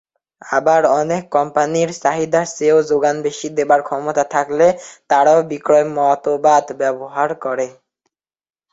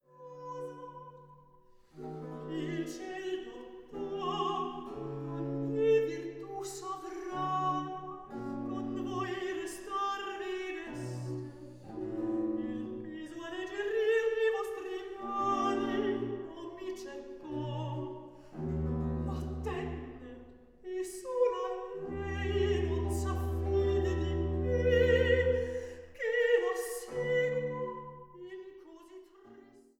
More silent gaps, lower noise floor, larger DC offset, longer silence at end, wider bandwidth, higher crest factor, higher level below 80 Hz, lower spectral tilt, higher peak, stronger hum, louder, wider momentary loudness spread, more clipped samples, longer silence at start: neither; first, -73 dBFS vs -60 dBFS; neither; first, 1 s vs 0.2 s; second, 8 kHz vs 16 kHz; about the same, 16 dB vs 18 dB; second, -62 dBFS vs -48 dBFS; second, -4.5 dB/octave vs -6 dB/octave; first, -2 dBFS vs -16 dBFS; neither; first, -16 LUFS vs -34 LUFS; second, 8 LU vs 17 LU; neither; first, 0.45 s vs 0.15 s